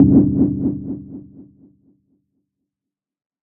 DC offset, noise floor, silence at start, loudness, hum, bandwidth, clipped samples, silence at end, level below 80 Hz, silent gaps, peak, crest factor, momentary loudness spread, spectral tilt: under 0.1%; -87 dBFS; 0 s; -18 LUFS; none; 1.5 kHz; under 0.1%; 2.1 s; -44 dBFS; none; -2 dBFS; 18 dB; 23 LU; -16 dB/octave